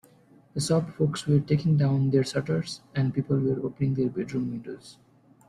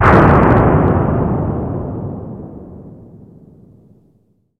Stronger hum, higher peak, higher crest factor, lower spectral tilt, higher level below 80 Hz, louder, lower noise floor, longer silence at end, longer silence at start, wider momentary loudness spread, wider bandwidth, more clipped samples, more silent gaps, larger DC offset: neither; second, -10 dBFS vs 0 dBFS; about the same, 16 dB vs 14 dB; second, -7 dB/octave vs -10 dB/octave; second, -58 dBFS vs -28 dBFS; second, -26 LUFS vs -13 LUFS; about the same, -57 dBFS vs -57 dBFS; second, 0.55 s vs 1.65 s; first, 0.55 s vs 0 s; second, 10 LU vs 23 LU; first, 11.5 kHz vs 7 kHz; neither; neither; neither